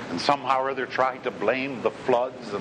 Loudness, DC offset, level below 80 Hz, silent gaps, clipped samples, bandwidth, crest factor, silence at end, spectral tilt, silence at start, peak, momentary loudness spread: -25 LUFS; under 0.1%; -64 dBFS; none; under 0.1%; 10.5 kHz; 20 dB; 0 s; -4.5 dB/octave; 0 s; -4 dBFS; 4 LU